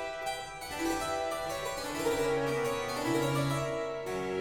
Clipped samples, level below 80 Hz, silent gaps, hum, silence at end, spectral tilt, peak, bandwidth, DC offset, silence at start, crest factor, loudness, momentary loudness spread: under 0.1%; -54 dBFS; none; none; 0 s; -4.5 dB/octave; -18 dBFS; 17.5 kHz; under 0.1%; 0 s; 14 dB; -33 LUFS; 6 LU